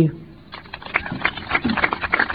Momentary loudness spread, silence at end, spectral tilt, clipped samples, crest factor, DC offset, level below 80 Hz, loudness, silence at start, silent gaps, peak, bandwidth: 19 LU; 0 s; -8.5 dB/octave; under 0.1%; 20 dB; 0.2%; -44 dBFS; -22 LUFS; 0 s; none; -2 dBFS; 5.2 kHz